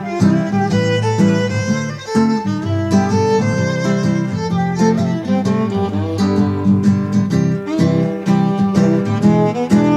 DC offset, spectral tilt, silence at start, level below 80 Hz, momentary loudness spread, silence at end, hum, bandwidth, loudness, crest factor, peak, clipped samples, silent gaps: under 0.1%; -7 dB/octave; 0 s; -50 dBFS; 4 LU; 0 s; none; 10.5 kHz; -16 LUFS; 14 dB; 0 dBFS; under 0.1%; none